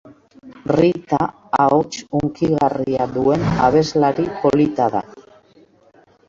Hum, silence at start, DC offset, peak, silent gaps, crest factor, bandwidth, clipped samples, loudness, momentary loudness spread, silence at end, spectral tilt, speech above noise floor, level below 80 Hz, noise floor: none; 0.05 s; under 0.1%; -2 dBFS; none; 16 dB; 7.8 kHz; under 0.1%; -18 LUFS; 6 LU; 1.1 s; -7 dB/octave; 35 dB; -46 dBFS; -52 dBFS